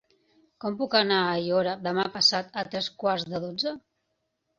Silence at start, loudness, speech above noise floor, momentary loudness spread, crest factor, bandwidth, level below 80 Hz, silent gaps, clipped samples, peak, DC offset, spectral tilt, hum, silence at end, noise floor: 0.6 s; -26 LUFS; 51 dB; 11 LU; 20 dB; 7.6 kHz; -70 dBFS; none; under 0.1%; -8 dBFS; under 0.1%; -3.5 dB/octave; none; 0.8 s; -78 dBFS